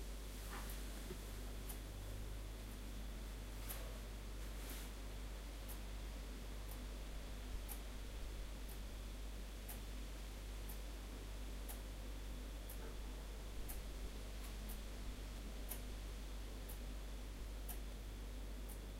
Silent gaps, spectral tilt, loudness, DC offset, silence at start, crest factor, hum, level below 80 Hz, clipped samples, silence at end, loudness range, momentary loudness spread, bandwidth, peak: none; -4.5 dB/octave; -51 LUFS; under 0.1%; 0 s; 18 dB; none; -50 dBFS; under 0.1%; 0 s; 1 LU; 2 LU; 16 kHz; -30 dBFS